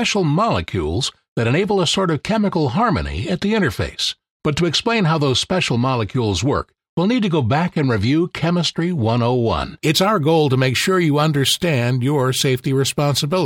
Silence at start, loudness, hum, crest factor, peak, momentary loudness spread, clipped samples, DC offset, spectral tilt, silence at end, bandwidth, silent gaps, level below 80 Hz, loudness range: 0 s; -18 LUFS; none; 16 dB; -2 dBFS; 6 LU; under 0.1%; under 0.1%; -5 dB/octave; 0 s; 16.5 kHz; 1.28-1.36 s, 4.31-4.40 s, 6.89-6.97 s; -40 dBFS; 2 LU